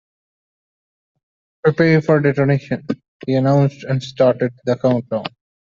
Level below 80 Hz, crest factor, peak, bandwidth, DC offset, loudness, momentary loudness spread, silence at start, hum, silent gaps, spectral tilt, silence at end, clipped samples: -58 dBFS; 16 dB; -2 dBFS; 7.2 kHz; under 0.1%; -18 LUFS; 11 LU; 1.65 s; none; 3.08-3.20 s; -8 dB/octave; 0.5 s; under 0.1%